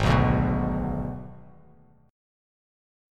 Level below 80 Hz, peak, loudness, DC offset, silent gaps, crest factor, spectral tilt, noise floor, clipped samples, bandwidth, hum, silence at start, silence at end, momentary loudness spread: -36 dBFS; -8 dBFS; -26 LUFS; under 0.1%; none; 20 dB; -7.5 dB/octave; -56 dBFS; under 0.1%; 10 kHz; none; 0 s; 1 s; 18 LU